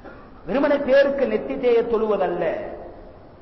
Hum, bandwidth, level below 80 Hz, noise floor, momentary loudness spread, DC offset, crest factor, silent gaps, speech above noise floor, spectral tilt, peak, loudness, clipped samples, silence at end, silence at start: none; 6 kHz; -48 dBFS; -43 dBFS; 19 LU; 0.2%; 12 dB; none; 23 dB; -7 dB/octave; -10 dBFS; -21 LUFS; under 0.1%; 0.05 s; 0.05 s